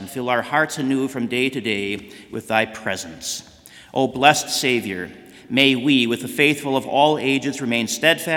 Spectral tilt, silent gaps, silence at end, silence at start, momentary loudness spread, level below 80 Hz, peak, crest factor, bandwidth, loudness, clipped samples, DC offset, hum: -3.5 dB/octave; none; 0 s; 0 s; 12 LU; -62 dBFS; 0 dBFS; 20 dB; 18 kHz; -20 LUFS; under 0.1%; under 0.1%; none